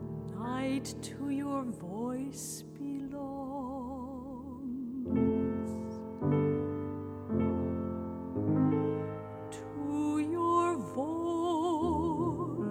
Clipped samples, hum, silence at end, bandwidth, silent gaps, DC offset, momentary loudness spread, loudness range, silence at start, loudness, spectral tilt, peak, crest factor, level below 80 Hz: under 0.1%; none; 0 s; 15.5 kHz; none; under 0.1%; 11 LU; 6 LU; 0 s; -34 LUFS; -7 dB/octave; -18 dBFS; 16 dB; -56 dBFS